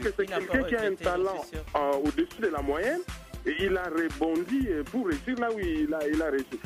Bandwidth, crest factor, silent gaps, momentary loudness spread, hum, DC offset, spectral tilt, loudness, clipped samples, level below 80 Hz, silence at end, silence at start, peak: 15.5 kHz; 18 dB; none; 4 LU; none; under 0.1%; -5.5 dB/octave; -29 LUFS; under 0.1%; -44 dBFS; 0 s; 0 s; -12 dBFS